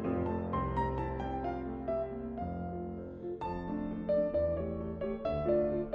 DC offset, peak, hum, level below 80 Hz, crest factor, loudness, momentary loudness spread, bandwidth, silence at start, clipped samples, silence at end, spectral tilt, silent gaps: under 0.1%; -20 dBFS; none; -48 dBFS; 16 dB; -35 LUFS; 8 LU; 5.8 kHz; 0 s; under 0.1%; 0 s; -10 dB/octave; none